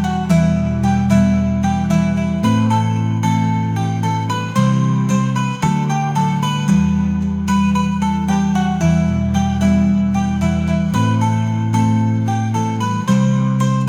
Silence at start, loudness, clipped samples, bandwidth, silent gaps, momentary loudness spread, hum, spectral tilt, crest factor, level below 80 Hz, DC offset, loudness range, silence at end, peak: 0 s; -16 LUFS; under 0.1%; 13.5 kHz; none; 4 LU; none; -7 dB/octave; 12 dB; -38 dBFS; under 0.1%; 1 LU; 0 s; -2 dBFS